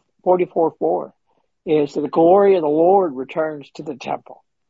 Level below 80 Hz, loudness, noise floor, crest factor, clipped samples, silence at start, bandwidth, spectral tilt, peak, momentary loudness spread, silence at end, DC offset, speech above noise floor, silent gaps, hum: -68 dBFS; -18 LUFS; -68 dBFS; 16 dB; under 0.1%; 0.25 s; 7.6 kHz; -8 dB/octave; -4 dBFS; 17 LU; 0.35 s; under 0.1%; 50 dB; none; none